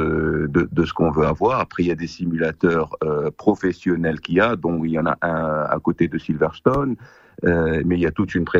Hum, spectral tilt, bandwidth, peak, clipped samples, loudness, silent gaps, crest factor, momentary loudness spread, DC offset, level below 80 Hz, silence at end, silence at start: none; -8 dB/octave; 7.4 kHz; -2 dBFS; under 0.1%; -21 LUFS; none; 18 dB; 4 LU; under 0.1%; -40 dBFS; 0 s; 0 s